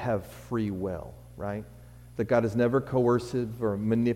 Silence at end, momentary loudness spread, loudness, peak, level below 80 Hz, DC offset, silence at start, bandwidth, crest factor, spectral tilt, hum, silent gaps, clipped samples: 0 s; 14 LU; -29 LUFS; -14 dBFS; -52 dBFS; under 0.1%; 0 s; 16 kHz; 16 dB; -8 dB/octave; none; none; under 0.1%